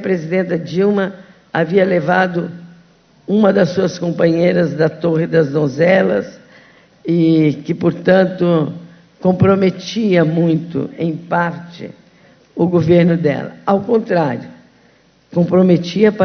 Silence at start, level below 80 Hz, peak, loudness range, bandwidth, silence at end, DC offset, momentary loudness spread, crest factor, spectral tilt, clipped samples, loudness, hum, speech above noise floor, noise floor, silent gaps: 0 s; -52 dBFS; 0 dBFS; 2 LU; 6.6 kHz; 0 s; under 0.1%; 11 LU; 16 dB; -8 dB/octave; under 0.1%; -15 LUFS; none; 37 dB; -52 dBFS; none